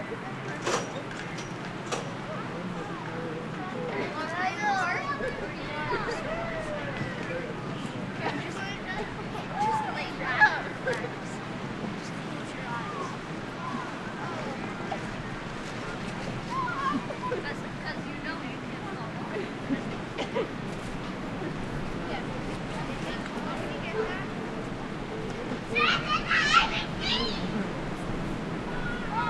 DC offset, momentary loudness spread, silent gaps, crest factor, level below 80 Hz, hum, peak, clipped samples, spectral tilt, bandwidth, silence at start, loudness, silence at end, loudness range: under 0.1%; 9 LU; none; 24 dB; -48 dBFS; none; -8 dBFS; under 0.1%; -4.5 dB/octave; 12.5 kHz; 0 s; -31 LUFS; 0 s; 8 LU